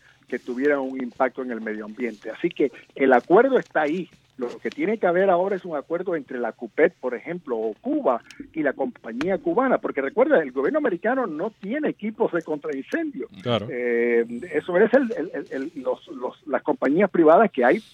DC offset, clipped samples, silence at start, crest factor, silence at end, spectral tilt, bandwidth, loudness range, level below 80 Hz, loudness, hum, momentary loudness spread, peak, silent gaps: under 0.1%; under 0.1%; 0.3 s; 20 dB; 0.1 s; -7.5 dB/octave; 8.6 kHz; 4 LU; -68 dBFS; -23 LUFS; none; 12 LU; -4 dBFS; none